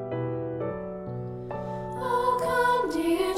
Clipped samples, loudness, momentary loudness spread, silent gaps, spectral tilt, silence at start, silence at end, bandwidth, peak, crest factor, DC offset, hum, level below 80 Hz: under 0.1%; -28 LUFS; 12 LU; none; -6 dB/octave; 0 s; 0 s; 16 kHz; -12 dBFS; 14 dB; under 0.1%; none; -52 dBFS